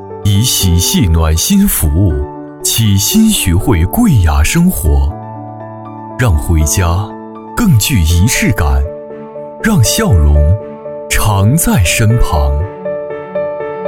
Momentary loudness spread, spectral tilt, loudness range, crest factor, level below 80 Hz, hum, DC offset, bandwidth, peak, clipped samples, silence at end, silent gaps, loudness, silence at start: 16 LU; -4.5 dB/octave; 3 LU; 12 dB; -18 dBFS; none; under 0.1%; 17.5 kHz; 0 dBFS; under 0.1%; 0 s; none; -11 LUFS; 0 s